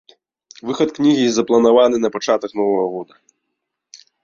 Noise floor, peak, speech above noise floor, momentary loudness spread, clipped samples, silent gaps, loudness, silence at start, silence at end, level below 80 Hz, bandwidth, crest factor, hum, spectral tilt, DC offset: -77 dBFS; -2 dBFS; 61 dB; 12 LU; under 0.1%; none; -16 LUFS; 0.65 s; 0.3 s; -62 dBFS; 7.4 kHz; 16 dB; none; -5 dB/octave; under 0.1%